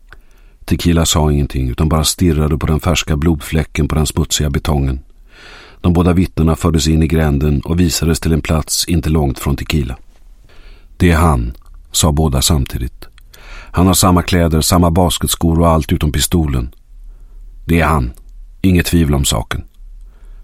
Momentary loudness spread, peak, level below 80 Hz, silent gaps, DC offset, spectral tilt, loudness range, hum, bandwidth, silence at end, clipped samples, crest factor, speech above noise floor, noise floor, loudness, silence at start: 8 LU; 0 dBFS; -22 dBFS; none; under 0.1%; -5 dB/octave; 3 LU; none; 16 kHz; 0 s; under 0.1%; 14 dB; 27 dB; -40 dBFS; -14 LUFS; 0.15 s